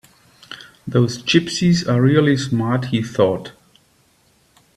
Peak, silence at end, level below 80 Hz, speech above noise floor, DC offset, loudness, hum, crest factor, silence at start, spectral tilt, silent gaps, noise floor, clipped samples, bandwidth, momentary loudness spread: 0 dBFS; 1.25 s; -54 dBFS; 41 dB; under 0.1%; -18 LUFS; none; 18 dB; 0.5 s; -6 dB/octave; none; -58 dBFS; under 0.1%; 12.5 kHz; 21 LU